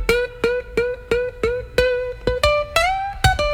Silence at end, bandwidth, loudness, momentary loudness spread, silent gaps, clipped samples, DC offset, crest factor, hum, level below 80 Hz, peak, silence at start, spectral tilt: 0 s; 18.5 kHz; -20 LUFS; 5 LU; none; under 0.1%; under 0.1%; 18 dB; none; -32 dBFS; -2 dBFS; 0 s; -4 dB/octave